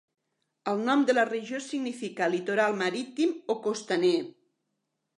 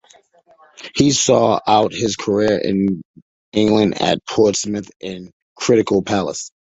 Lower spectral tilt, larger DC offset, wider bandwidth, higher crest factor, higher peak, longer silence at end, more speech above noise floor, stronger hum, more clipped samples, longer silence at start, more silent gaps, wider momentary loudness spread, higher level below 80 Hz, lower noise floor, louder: about the same, -4.5 dB/octave vs -4.5 dB/octave; neither; first, 11 kHz vs 8.4 kHz; about the same, 18 dB vs 18 dB; second, -10 dBFS vs 0 dBFS; first, 0.85 s vs 0.25 s; first, 53 dB vs 35 dB; neither; neither; second, 0.65 s vs 0.8 s; second, none vs 3.05-3.14 s, 3.22-3.52 s, 4.96-5.00 s, 5.33-5.56 s; second, 9 LU vs 14 LU; second, -84 dBFS vs -50 dBFS; first, -81 dBFS vs -52 dBFS; second, -28 LUFS vs -17 LUFS